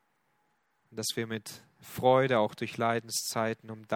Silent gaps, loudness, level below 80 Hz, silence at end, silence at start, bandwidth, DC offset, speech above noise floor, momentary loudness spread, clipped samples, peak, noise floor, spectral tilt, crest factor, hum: none; -30 LUFS; -74 dBFS; 0 s; 0.9 s; 18.5 kHz; under 0.1%; 44 dB; 19 LU; under 0.1%; -10 dBFS; -74 dBFS; -4 dB/octave; 22 dB; none